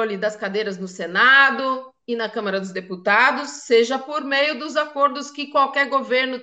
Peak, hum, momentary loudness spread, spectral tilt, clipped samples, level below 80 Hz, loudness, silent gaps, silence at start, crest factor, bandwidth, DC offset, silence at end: -2 dBFS; none; 14 LU; -3 dB/octave; under 0.1%; -76 dBFS; -19 LUFS; none; 0 s; 18 dB; 8.8 kHz; under 0.1%; 0 s